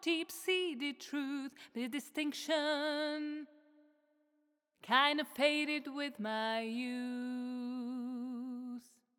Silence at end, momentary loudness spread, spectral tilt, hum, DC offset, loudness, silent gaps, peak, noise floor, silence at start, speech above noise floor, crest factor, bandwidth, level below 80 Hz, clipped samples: 0.4 s; 12 LU; -2.5 dB/octave; none; under 0.1%; -37 LUFS; none; -14 dBFS; -79 dBFS; 0 s; 43 dB; 24 dB; over 20 kHz; under -90 dBFS; under 0.1%